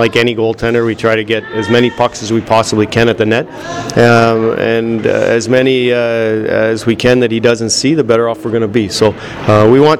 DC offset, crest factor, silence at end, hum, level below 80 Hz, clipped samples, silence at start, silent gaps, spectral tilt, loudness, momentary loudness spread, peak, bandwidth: under 0.1%; 10 dB; 0 s; none; -40 dBFS; under 0.1%; 0 s; none; -5 dB/octave; -11 LUFS; 6 LU; 0 dBFS; 14 kHz